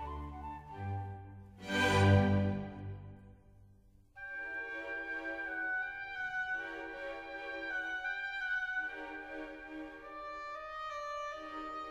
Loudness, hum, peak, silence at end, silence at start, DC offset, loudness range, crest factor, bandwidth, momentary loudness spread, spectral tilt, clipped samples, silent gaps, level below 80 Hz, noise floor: -37 LUFS; none; -16 dBFS; 0 s; 0 s; under 0.1%; 7 LU; 22 dB; 11.5 kHz; 16 LU; -6 dB/octave; under 0.1%; none; -58 dBFS; -63 dBFS